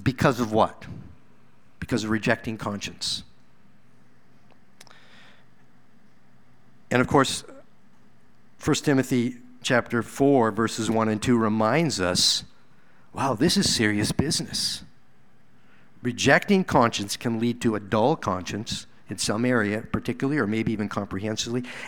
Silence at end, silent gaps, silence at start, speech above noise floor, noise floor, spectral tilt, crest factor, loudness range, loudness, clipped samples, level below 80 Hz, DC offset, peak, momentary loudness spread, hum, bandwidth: 0 s; none; 0 s; 37 dB; -61 dBFS; -4.5 dB/octave; 24 dB; 7 LU; -24 LUFS; under 0.1%; -52 dBFS; 0.5%; -2 dBFS; 11 LU; none; 19.5 kHz